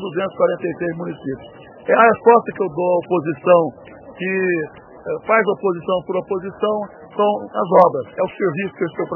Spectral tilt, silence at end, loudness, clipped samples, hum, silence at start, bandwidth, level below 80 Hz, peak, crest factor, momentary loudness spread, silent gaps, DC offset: -9.5 dB/octave; 0 s; -18 LUFS; under 0.1%; none; 0 s; 3.2 kHz; -60 dBFS; 0 dBFS; 18 dB; 14 LU; none; under 0.1%